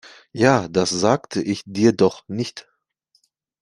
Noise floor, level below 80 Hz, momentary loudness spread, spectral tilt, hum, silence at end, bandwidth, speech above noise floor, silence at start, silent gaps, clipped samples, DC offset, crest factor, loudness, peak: -66 dBFS; -58 dBFS; 12 LU; -5 dB/octave; none; 1 s; 11.5 kHz; 47 dB; 0.05 s; none; under 0.1%; under 0.1%; 20 dB; -20 LUFS; -2 dBFS